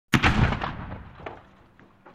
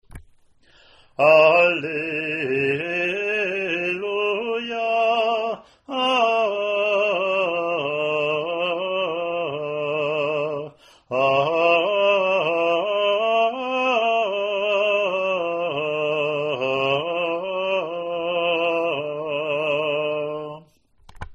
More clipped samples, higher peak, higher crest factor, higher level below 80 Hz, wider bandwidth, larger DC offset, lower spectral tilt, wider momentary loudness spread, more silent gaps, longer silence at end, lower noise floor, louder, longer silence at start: neither; about the same, -2 dBFS vs -2 dBFS; about the same, 24 dB vs 20 dB; first, -36 dBFS vs -58 dBFS; first, 15.5 kHz vs 8.6 kHz; neither; about the same, -5.5 dB/octave vs -5 dB/octave; first, 21 LU vs 8 LU; neither; about the same, 0.05 s vs 0 s; about the same, -55 dBFS vs -55 dBFS; second, -24 LUFS vs -21 LUFS; about the same, 0.1 s vs 0.1 s